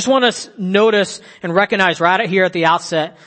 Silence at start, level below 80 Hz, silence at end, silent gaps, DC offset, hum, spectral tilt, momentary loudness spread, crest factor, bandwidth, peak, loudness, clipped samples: 0 s; -62 dBFS; 0.15 s; none; under 0.1%; none; -4 dB/octave; 8 LU; 16 dB; 8.8 kHz; 0 dBFS; -15 LUFS; under 0.1%